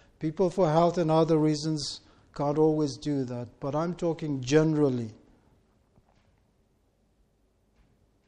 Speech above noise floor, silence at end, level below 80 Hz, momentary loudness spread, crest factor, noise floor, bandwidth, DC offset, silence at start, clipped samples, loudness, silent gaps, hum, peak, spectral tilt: 42 dB; 3.15 s; -58 dBFS; 12 LU; 18 dB; -68 dBFS; 10 kHz; under 0.1%; 0.2 s; under 0.1%; -27 LUFS; none; none; -10 dBFS; -6.5 dB/octave